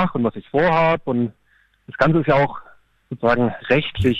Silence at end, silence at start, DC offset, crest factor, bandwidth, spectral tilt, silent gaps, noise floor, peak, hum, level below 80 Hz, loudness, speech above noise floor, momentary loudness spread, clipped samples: 0 s; 0 s; under 0.1%; 14 dB; 8 kHz; -8 dB/octave; none; -60 dBFS; -4 dBFS; none; -42 dBFS; -19 LUFS; 41 dB; 10 LU; under 0.1%